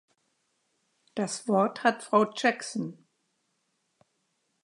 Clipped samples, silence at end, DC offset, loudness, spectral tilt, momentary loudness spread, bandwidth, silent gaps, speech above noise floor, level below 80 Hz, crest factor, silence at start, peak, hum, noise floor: under 0.1%; 1.7 s; under 0.1%; -27 LUFS; -4.5 dB/octave; 12 LU; 11 kHz; none; 49 dB; -84 dBFS; 24 dB; 1.15 s; -8 dBFS; none; -76 dBFS